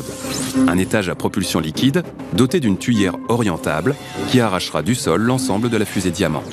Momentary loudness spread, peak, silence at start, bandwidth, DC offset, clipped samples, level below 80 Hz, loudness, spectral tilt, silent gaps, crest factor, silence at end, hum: 5 LU; 0 dBFS; 0 s; 14 kHz; under 0.1%; under 0.1%; -48 dBFS; -19 LUFS; -5 dB/octave; none; 18 dB; 0 s; none